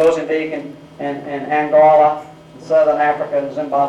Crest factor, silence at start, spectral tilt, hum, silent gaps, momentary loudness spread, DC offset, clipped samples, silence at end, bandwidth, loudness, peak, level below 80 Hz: 12 dB; 0 s; -6 dB/octave; none; none; 16 LU; under 0.1%; under 0.1%; 0 s; 9.6 kHz; -16 LUFS; -4 dBFS; -58 dBFS